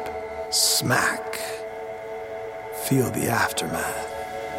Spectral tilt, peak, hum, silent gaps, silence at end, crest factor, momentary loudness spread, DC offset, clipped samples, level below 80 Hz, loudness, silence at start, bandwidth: -3 dB/octave; -6 dBFS; none; none; 0 s; 20 dB; 15 LU; under 0.1%; under 0.1%; -54 dBFS; -25 LUFS; 0 s; 17 kHz